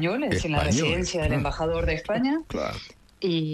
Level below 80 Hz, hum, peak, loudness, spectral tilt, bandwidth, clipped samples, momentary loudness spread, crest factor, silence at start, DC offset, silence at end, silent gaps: -38 dBFS; none; -10 dBFS; -26 LUFS; -5 dB/octave; 13 kHz; under 0.1%; 8 LU; 16 dB; 0 s; under 0.1%; 0 s; none